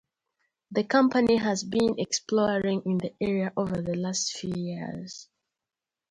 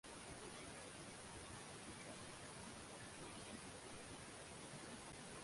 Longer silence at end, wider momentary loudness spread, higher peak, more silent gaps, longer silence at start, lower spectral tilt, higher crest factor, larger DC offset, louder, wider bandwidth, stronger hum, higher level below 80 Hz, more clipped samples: first, 0.9 s vs 0 s; first, 12 LU vs 1 LU; first, -8 dBFS vs -40 dBFS; neither; first, 0.7 s vs 0.05 s; first, -4.5 dB/octave vs -3 dB/octave; first, 20 dB vs 14 dB; neither; first, -27 LUFS vs -54 LUFS; about the same, 11 kHz vs 11.5 kHz; neither; first, -60 dBFS vs -70 dBFS; neither